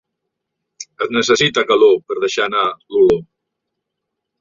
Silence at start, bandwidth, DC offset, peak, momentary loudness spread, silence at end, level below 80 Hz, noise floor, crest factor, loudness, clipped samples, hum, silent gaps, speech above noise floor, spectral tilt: 0.8 s; 7.6 kHz; under 0.1%; -2 dBFS; 10 LU; 1.15 s; -54 dBFS; -78 dBFS; 16 dB; -15 LUFS; under 0.1%; none; none; 64 dB; -3.5 dB/octave